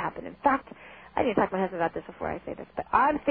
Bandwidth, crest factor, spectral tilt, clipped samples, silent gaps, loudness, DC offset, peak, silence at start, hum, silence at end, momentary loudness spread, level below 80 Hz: 4.9 kHz; 20 dB; -10 dB/octave; under 0.1%; none; -28 LUFS; under 0.1%; -8 dBFS; 0 s; none; 0 s; 13 LU; -54 dBFS